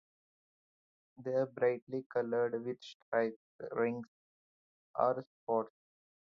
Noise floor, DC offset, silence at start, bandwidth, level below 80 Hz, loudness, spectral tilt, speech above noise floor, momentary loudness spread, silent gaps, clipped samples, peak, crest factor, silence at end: under -90 dBFS; under 0.1%; 1.2 s; 6.8 kHz; -86 dBFS; -36 LUFS; -5 dB/octave; over 55 dB; 12 LU; 1.82-1.87 s, 2.06-2.10 s, 2.95-3.12 s, 3.36-3.59 s, 4.08-4.94 s, 5.26-5.47 s; under 0.1%; -18 dBFS; 20 dB; 0.7 s